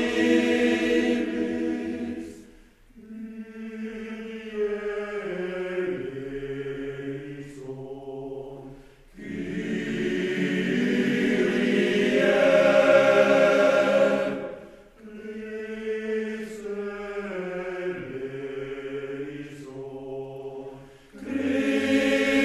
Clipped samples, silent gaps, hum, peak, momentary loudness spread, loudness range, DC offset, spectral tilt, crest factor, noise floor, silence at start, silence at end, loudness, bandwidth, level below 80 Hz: under 0.1%; none; none; -6 dBFS; 20 LU; 15 LU; under 0.1%; -5.5 dB/octave; 20 dB; -53 dBFS; 0 s; 0 s; -25 LUFS; 13 kHz; -56 dBFS